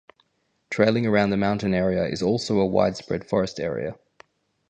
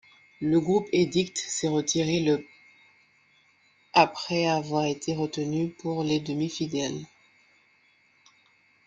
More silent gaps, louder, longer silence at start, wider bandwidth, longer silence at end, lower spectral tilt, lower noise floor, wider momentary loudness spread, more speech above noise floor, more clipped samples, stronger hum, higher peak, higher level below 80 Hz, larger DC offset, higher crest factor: neither; first, -23 LUFS vs -26 LUFS; first, 0.7 s vs 0.4 s; about the same, 9.4 kHz vs 9.6 kHz; second, 0.75 s vs 1.8 s; first, -6.5 dB/octave vs -4.5 dB/octave; first, -71 dBFS vs -64 dBFS; about the same, 9 LU vs 7 LU; first, 48 dB vs 37 dB; neither; neither; about the same, -4 dBFS vs -4 dBFS; first, -52 dBFS vs -66 dBFS; neither; about the same, 20 dB vs 24 dB